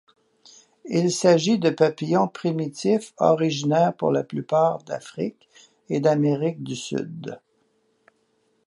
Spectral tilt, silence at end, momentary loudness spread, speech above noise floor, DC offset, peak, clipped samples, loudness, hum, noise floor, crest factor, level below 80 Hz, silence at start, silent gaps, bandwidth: -6 dB/octave; 1.3 s; 13 LU; 45 dB; under 0.1%; -4 dBFS; under 0.1%; -23 LUFS; none; -68 dBFS; 18 dB; -72 dBFS; 0.85 s; none; 11.5 kHz